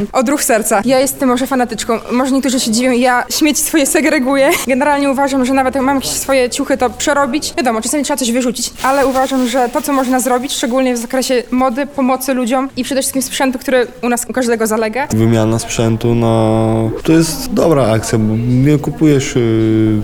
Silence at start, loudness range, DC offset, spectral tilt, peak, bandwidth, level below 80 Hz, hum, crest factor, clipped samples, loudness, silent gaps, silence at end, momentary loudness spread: 0 s; 3 LU; under 0.1%; -4.5 dB/octave; 0 dBFS; over 20 kHz; -36 dBFS; none; 12 dB; under 0.1%; -13 LUFS; none; 0 s; 4 LU